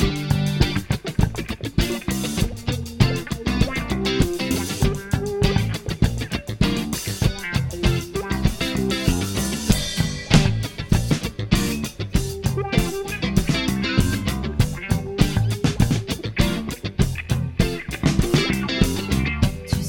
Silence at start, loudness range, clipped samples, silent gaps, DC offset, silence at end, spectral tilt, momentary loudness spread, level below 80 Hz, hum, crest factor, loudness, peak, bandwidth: 0 s; 2 LU; under 0.1%; none; under 0.1%; 0 s; -5 dB/octave; 5 LU; -30 dBFS; none; 22 dB; -22 LUFS; 0 dBFS; 17.5 kHz